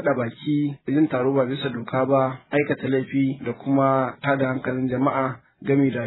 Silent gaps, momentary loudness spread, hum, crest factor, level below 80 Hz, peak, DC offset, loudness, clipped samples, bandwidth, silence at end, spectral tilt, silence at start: none; 5 LU; none; 16 dB; -62 dBFS; -6 dBFS; under 0.1%; -23 LUFS; under 0.1%; 4.1 kHz; 0 s; -11.5 dB/octave; 0 s